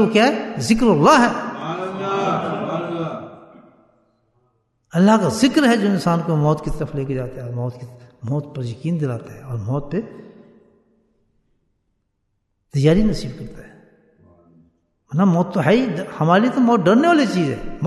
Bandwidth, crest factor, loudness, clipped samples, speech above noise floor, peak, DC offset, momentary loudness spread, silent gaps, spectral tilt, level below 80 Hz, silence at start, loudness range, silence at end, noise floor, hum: 12.5 kHz; 18 dB; -19 LUFS; under 0.1%; 53 dB; -2 dBFS; under 0.1%; 15 LU; none; -6.5 dB/octave; -42 dBFS; 0 s; 10 LU; 0 s; -71 dBFS; none